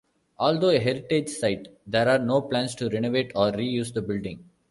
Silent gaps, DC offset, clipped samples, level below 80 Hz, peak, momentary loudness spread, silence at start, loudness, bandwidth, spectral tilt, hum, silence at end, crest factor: none; under 0.1%; under 0.1%; -58 dBFS; -8 dBFS; 9 LU; 0.4 s; -25 LUFS; 11.5 kHz; -5.5 dB/octave; none; 0.3 s; 18 dB